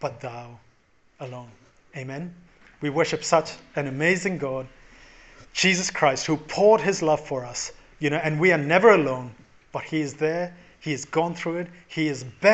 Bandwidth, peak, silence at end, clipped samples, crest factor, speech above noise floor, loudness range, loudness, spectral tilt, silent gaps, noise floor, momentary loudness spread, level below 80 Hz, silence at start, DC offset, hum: 8.4 kHz; -2 dBFS; 0 s; under 0.1%; 22 dB; 37 dB; 7 LU; -23 LUFS; -4.5 dB/octave; none; -60 dBFS; 19 LU; -58 dBFS; 0 s; under 0.1%; none